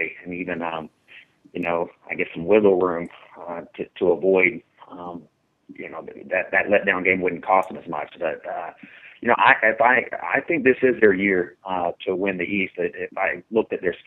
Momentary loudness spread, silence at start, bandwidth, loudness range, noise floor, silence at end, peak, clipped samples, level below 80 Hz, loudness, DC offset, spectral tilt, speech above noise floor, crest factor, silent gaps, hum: 19 LU; 0 s; 4.1 kHz; 5 LU; -54 dBFS; 0.1 s; 0 dBFS; under 0.1%; -62 dBFS; -21 LUFS; under 0.1%; -7.5 dB/octave; 33 dB; 22 dB; none; none